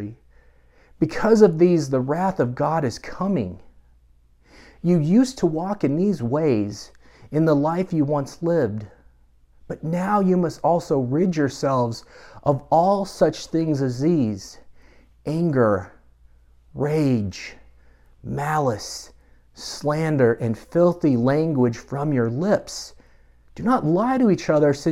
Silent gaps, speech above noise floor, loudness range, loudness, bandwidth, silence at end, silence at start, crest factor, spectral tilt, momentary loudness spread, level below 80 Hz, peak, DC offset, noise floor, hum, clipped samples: none; 35 dB; 4 LU; -21 LUFS; 13.5 kHz; 0 s; 0 s; 20 dB; -7 dB/octave; 14 LU; -52 dBFS; -2 dBFS; under 0.1%; -55 dBFS; none; under 0.1%